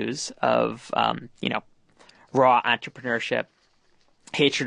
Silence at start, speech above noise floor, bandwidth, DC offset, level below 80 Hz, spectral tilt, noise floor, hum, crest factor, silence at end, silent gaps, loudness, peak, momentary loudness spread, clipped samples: 0 s; 38 dB; 10.5 kHz; under 0.1%; -68 dBFS; -4 dB/octave; -62 dBFS; none; 20 dB; 0 s; none; -24 LUFS; -6 dBFS; 11 LU; under 0.1%